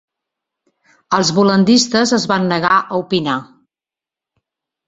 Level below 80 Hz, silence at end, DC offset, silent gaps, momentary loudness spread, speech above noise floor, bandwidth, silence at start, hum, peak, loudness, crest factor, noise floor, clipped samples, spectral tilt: -56 dBFS; 1.45 s; under 0.1%; none; 7 LU; 75 dB; 8.2 kHz; 1.1 s; none; 0 dBFS; -14 LUFS; 16 dB; -89 dBFS; under 0.1%; -4.5 dB/octave